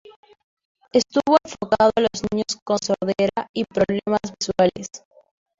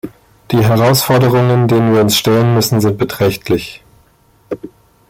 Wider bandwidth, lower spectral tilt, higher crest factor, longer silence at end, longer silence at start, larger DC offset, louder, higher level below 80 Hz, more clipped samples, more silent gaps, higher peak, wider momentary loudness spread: second, 8 kHz vs 16.5 kHz; about the same, -4.5 dB/octave vs -5.5 dB/octave; first, 20 dB vs 12 dB; first, 0.65 s vs 0.45 s; first, 0.95 s vs 0.05 s; neither; second, -21 LUFS vs -12 LUFS; second, -54 dBFS vs -44 dBFS; neither; first, 2.62-2.66 s, 3.49-3.54 s vs none; about the same, -2 dBFS vs 0 dBFS; second, 8 LU vs 17 LU